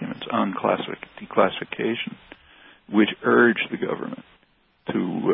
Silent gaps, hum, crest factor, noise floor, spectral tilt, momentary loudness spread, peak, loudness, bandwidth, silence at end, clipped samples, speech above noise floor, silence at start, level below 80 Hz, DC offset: none; none; 20 dB; -63 dBFS; -10 dB/octave; 17 LU; -4 dBFS; -23 LUFS; 4 kHz; 0 s; under 0.1%; 40 dB; 0 s; -64 dBFS; under 0.1%